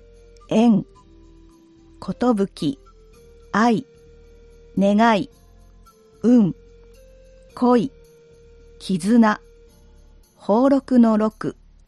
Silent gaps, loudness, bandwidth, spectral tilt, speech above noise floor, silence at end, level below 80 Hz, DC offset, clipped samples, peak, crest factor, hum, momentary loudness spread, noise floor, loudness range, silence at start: none; -19 LUFS; 11 kHz; -7 dB/octave; 33 dB; 0.35 s; -50 dBFS; under 0.1%; under 0.1%; -4 dBFS; 16 dB; none; 17 LU; -50 dBFS; 5 LU; 0.5 s